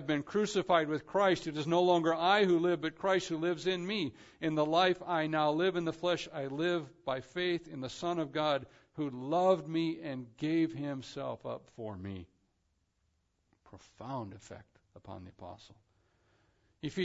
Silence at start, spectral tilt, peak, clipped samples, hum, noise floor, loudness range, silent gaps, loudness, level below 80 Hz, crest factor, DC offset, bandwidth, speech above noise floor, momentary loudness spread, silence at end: 0 s; -4 dB/octave; -14 dBFS; under 0.1%; none; -78 dBFS; 19 LU; none; -33 LUFS; -70 dBFS; 20 dB; under 0.1%; 7.6 kHz; 45 dB; 17 LU; 0 s